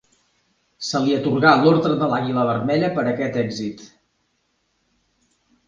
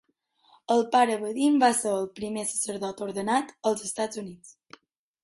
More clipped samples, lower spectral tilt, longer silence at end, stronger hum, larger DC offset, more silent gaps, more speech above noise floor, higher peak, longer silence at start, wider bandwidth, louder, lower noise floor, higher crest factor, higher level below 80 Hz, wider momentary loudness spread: neither; first, -6 dB/octave vs -3.5 dB/octave; first, 1.8 s vs 0.7 s; neither; neither; neither; first, 50 dB vs 40 dB; first, 0 dBFS vs -8 dBFS; about the same, 0.8 s vs 0.7 s; second, 9.4 kHz vs 12 kHz; first, -19 LUFS vs -26 LUFS; about the same, -69 dBFS vs -66 dBFS; about the same, 20 dB vs 18 dB; first, -60 dBFS vs -70 dBFS; first, 14 LU vs 11 LU